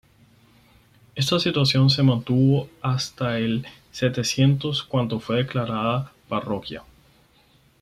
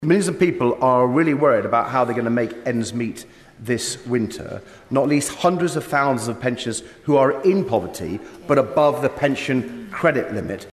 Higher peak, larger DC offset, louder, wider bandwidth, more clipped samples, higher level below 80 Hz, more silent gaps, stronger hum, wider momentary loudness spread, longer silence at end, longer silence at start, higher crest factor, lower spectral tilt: about the same, -6 dBFS vs -6 dBFS; neither; second, -23 LUFS vs -20 LUFS; about the same, 14 kHz vs 13.5 kHz; neither; about the same, -56 dBFS vs -54 dBFS; neither; neither; about the same, 11 LU vs 12 LU; first, 1 s vs 0 s; first, 1.15 s vs 0 s; about the same, 16 dB vs 14 dB; about the same, -6 dB/octave vs -5.5 dB/octave